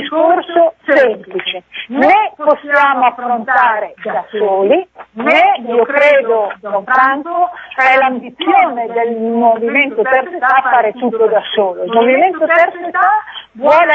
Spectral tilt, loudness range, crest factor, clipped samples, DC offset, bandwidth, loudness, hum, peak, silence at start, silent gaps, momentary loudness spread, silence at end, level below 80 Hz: -5.5 dB/octave; 1 LU; 12 dB; under 0.1%; under 0.1%; 7.4 kHz; -12 LUFS; none; 0 dBFS; 0 s; none; 9 LU; 0 s; -62 dBFS